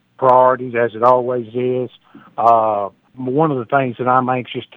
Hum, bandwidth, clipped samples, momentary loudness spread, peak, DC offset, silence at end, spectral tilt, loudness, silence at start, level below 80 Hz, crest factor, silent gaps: none; 5.4 kHz; under 0.1%; 11 LU; 0 dBFS; under 0.1%; 0.1 s; -9 dB/octave; -16 LUFS; 0.2 s; -68 dBFS; 16 dB; none